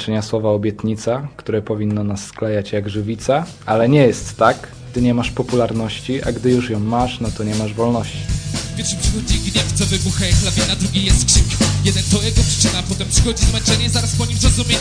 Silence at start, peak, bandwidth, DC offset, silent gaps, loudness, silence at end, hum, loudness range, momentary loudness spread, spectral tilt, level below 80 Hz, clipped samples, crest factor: 0 s; 0 dBFS; 10.5 kHz; under 0.1%; none; -17 LUFS; 0 s; none; 5 LU; 8 LU; -4.5 dB/octave; -26 dBFS; under 0.1%; 16 dB